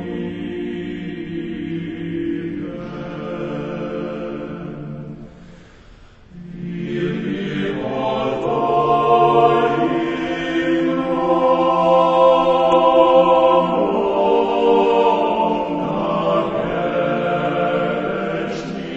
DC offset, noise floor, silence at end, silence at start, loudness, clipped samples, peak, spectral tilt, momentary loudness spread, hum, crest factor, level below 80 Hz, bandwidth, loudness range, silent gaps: under 0.1%; -44 dBFS; 0 s; 0 s; -18 LUFS; under 0.1%; 0 dBFS; -7.5 dB/octave; 15 LU; none; 18 dB; -48 dBFS; 8 kHz; 14 LU; none